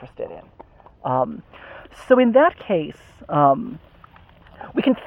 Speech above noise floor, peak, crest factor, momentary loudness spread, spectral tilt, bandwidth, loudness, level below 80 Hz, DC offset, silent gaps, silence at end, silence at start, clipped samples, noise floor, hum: 30 dB; -2 dBFS; 20 dB; 25 LU; -8 dB/octave; 9.8 kHz; -19 LUFS; -54 dBFS; under 0.1%; none; 0 s; 0 s; under 0.1%; -48 dBFS; none